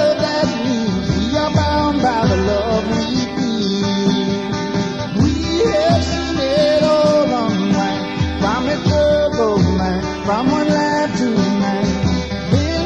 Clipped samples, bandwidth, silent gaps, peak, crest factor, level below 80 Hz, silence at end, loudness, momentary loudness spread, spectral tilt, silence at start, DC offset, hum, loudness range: under 0.1%; 9.8 kHz; none; -4 dBFS; 12 dB; -32 dBFS; 0 s; -17 LUFS; 5 LU; -6 dB/octave; 0 s; under 0.1%; none; 2 LU